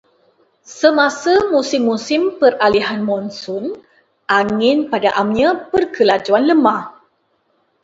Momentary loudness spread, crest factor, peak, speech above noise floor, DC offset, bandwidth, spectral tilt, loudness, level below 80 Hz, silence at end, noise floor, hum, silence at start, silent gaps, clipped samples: 11 LU; 16 dB; 0 dBFS; 48 dB; under 0.1%; 8 kHz; -4.5 dB/octave; -15 LUFS; -54 dBFS; 0.9 s; -63 dBFS; none; 0.7 s; none; under 0.1%